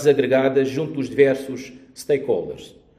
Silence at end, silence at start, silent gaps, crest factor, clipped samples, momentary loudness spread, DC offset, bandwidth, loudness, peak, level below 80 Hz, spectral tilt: 0.3 s; 0 s; none; 20 dB; under 0.1%; 18 LU; under 0.1%; 14 kHz; -20 LUFS; -2 dBFS; -58 dBFS; -6 dB/octave